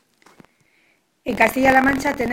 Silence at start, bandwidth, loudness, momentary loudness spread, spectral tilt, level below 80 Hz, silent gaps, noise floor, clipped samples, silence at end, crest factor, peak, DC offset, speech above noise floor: 1.25 s; 17 kHz; -17 LUFS; 14 LU; -4.5 dB/octave; -46 dBFS; none; -62 dBFS; under 0.1%; 0 s; 20 dB; 0 dBFS; under 0.1%; 45 dB